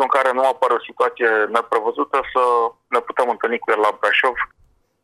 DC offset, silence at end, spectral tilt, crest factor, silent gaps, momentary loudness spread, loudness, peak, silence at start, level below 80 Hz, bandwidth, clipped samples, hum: under 0.1%; 0.6 s; -2.5 dB/octave; 18 dB; none; 5 LU; -19 LUFS; -2 dBFS; 0 s; -60 dBFS; 13 kHz; under 0.1%; none